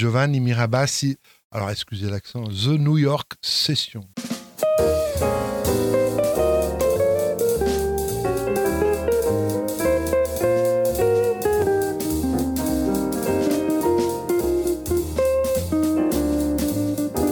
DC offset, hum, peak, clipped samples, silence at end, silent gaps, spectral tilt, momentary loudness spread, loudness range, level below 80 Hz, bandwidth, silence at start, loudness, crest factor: under 0.1%; none; -6 dBFS; under 0.1%; 0 s; 1.44-1.50 s; -5.5 dB/octave; 7 LU; 2 LU; -38 dBFS; 19.5 kHz; 0 s; -22 LUFS; 14 dB